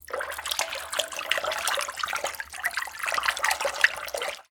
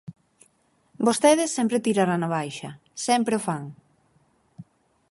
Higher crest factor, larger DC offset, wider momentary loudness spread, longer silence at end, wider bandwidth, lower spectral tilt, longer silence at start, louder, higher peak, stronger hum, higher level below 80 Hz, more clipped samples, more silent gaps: first, 28 dB vs 20 dB; neither; second, 8 LU vs 15 LU; second, 0.1 s vs 0.5 s; first, 19 kHz vs 11.5 kHz; second, 1.5 dB/octave vs -4.5 dB/octave; about the same, 0.1 s vs 0.1 s; second, -27 LUFS vs -23 LUFS; first, -2 dBFS vs -6 dBFS; neither; first, -60 dBFS vs -70 dBFS; neither; neither